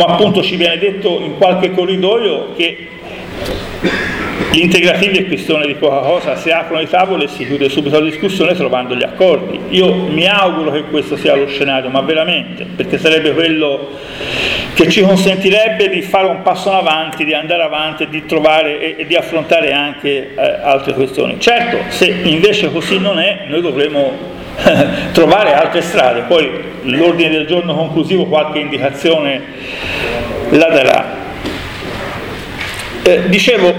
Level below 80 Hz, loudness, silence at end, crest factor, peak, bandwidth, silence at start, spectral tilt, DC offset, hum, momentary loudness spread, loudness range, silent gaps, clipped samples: -40 dBFS; -12 LUFS; 0 s; 12 dB; 0 dBFS; 18 kHz; 0 s; -5 dB/octave; under 0.1%; none; 11 LU; 3 LU; none; under 0.1%